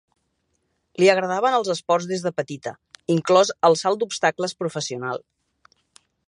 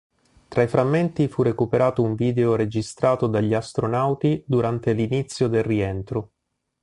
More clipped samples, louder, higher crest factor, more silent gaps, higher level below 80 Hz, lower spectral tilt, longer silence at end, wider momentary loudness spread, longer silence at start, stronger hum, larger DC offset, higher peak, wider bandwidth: neither; about the same, -21 LUFS vs -22 LUFS; first, 22 dB vs 16 dB; neither; second, -72 dBFS vs -50 dBFS; second, -4.5 dB/octave vs -7.5 dB/octave; first, 1.1 s vs 0.55 s; first, 15 LU vs 5 LU; first, 1 s vs 0.5 s; neither; neither; first, -2 dBFS vs -6 dBFS; about the same, 11 kHz vs 11.5 kHz